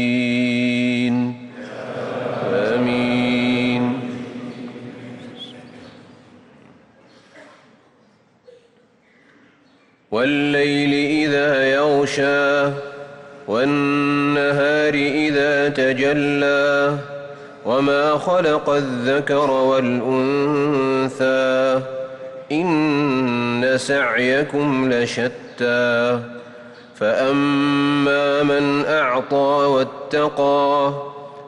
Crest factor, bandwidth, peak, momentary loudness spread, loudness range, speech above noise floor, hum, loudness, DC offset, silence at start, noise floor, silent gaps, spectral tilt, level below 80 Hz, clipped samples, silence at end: 10 dB; 10.5 kHz; -8 dBFS; 15 LU; 5 LU; 38 dB; none; -18 LUFS; under 0.1%; 0 s; -55 dBFS; none; -5.5 dB/octave; -58 dBFS; under 0.1%; 0 s